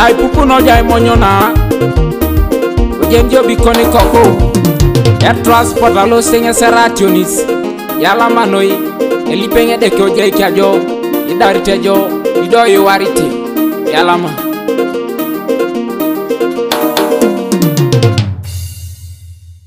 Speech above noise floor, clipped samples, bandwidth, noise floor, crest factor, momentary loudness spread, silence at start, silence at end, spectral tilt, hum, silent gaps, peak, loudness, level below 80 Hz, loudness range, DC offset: 25 dB; 0.8%; 16.5 kHz; -33 dBFS; 10 dB; 8 LU; 0 s; 0.15 s; -5.5 dB/octave; none; none; 0 dBFS; -10 LUFS; -22 dBFS; 5 LU; under 0.1%